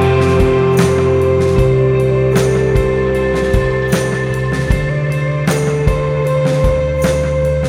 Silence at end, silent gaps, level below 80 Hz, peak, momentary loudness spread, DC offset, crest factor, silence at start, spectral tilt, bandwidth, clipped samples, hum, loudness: 0 s; none; -24 dBFS; 0 dBFS; 4 LU; under 0.1%; 12 dB; 0 s; -7 dB/octave; 16 kHz; under 0.1%; none; -14 LUFS